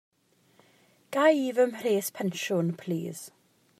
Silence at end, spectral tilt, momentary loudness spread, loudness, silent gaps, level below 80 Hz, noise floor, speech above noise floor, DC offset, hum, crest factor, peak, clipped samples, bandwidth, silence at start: 0.5 s; -5 dB/octave; 14 LU; -28 LUFS; none; -84 dBFS; -64 dBFS; 37 dB; under 0.1%; none; 20 dB; -10 dBFS; under 0.1%; 15.5 kHz; 1.1 s